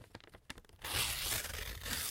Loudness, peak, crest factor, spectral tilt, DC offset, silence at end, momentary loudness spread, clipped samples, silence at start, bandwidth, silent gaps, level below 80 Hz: -37 LUFS; -20 dBFS; 20 dB; -1 dB/octave; under 0.1%; 0 s; 19 LU; under 0.1%; 0 s; 17 kHz; none; -52 dBFS